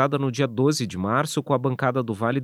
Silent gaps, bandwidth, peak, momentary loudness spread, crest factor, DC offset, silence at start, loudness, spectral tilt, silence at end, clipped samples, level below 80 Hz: none; 15.5 kHz; -6 dBFS; 3 LU; 18 dB; under 0.1%; 0 s; -24 LUFS; -6 dB/octave; 0 s; under 0.1%; -64 dBFS